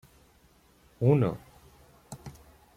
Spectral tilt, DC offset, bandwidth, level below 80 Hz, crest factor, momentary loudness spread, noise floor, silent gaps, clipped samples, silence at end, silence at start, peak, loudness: -9 dB/octave; under 0.1%; 15.5 kHz; -60 dBFS; 22 dB; 24 LU; -62 dBFS; none; under 0.1%; 0.45 s; 1 s; -10 dBFS; -26 LUFS